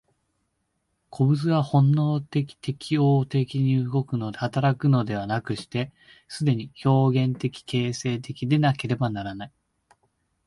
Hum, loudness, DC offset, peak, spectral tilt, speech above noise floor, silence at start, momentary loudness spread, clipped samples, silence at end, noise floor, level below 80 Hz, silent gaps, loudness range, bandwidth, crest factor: none; -24 LUFS; under 0.1%; -10 dBFS; -7.5 dB/octave; 51 dB; 1.1 s; 11 LU; under 0.1%; 1 s; -75 dBFS; -60 dBFS; none; 3 LU; 11.5 kHz; 16 dB